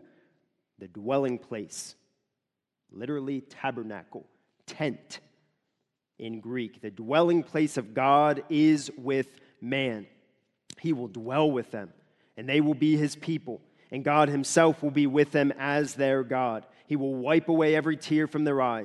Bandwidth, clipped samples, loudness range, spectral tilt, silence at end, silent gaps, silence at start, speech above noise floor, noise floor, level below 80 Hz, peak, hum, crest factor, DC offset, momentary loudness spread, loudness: 12 kHz; under 0.1%; 12 LU; -5.5 dB/octave; 0 s; none; 0.8 s; 59 dB; -86 dBFS; -76 dBFS; -6 dBFS; none; 22 dB; under 0.1%; 17 LU; -27 LUFS